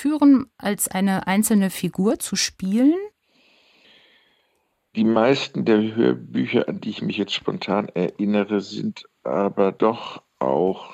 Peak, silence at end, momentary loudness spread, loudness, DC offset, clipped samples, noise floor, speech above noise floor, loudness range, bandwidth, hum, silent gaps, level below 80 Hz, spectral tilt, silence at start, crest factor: -6 dBFS; 0 s; 10 LU; -21 LUFS; under 0.1%; under 0.1%; -69 dBFS; 48 dB; 3 LU; 16 kHz; none; none; -62 dBFS; -5 dB/octave; 0 s; 16 dB